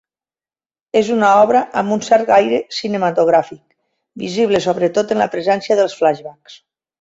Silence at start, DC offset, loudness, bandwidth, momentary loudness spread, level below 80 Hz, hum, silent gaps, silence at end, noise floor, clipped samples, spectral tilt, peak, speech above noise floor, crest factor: 0.95 s; under 0.1%; -15 LUFS; 8 kHz; 9 LU; -60 dBFS; none; none; 0.45 s; under -90 dBFS; under 0.1%; -5 dB/octave; -2 dBFS; over 75 dB; 14 dB